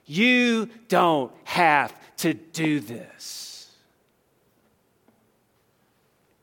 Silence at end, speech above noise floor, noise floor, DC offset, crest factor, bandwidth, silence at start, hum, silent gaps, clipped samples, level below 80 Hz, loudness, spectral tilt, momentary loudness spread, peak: 2.8 s; 43 dB; -66 dBFS; under 0.1%; 22 dB; 17.5 kHz; 0.1 s; none; none; under 0.1%; -74 dBFS; -23 LUFS; -4.5 dB/octave; 18 LU; -4 dBFS